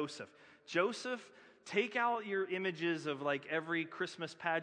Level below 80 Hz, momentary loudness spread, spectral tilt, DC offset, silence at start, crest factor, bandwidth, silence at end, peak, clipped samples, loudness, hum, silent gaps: under -90 dBFS; 8 LU; -4.5 dB/octave; under 0.1%; 0 s; 20 dB; 10 kHz; 0 s; -18 dBFS; under 0.1%; -37 LUFS; none; none